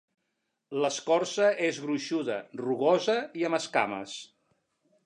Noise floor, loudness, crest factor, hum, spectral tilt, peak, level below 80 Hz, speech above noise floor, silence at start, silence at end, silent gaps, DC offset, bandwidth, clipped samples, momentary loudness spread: -80 dBFS; -28 LUFS; 20 dB; none; -4 dB/octave; -10 dBFS; -82 dBFS; 52 dB; 0.7 s; 0.8 s; none; under 0.1%; 11 kHz; under 0.1%; 10 LU